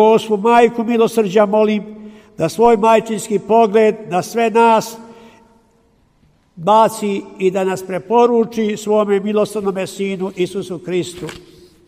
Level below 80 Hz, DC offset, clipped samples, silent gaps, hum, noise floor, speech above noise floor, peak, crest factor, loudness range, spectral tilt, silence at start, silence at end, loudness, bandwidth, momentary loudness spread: -56 dBFS; under 0.1%; under 0.1%; none; none; -55 dBFS; 41 dB; 0 dBFS; 16 dB; 4 LU; -5.5 dB/octave; 0 s; 0.5 s; -15 LUFS; 15.5 kHz; 10 LU